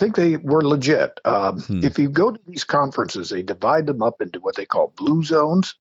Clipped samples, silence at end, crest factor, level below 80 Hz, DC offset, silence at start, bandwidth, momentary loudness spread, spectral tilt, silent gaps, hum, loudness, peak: under 0.1%; 0.1 s; 14 dB; -58 dBFS; under 0.1%; 0 s; 8 kHz; 8 LU; -6.5 dB/octave; none; none; -20 LUFS; -6 dBFS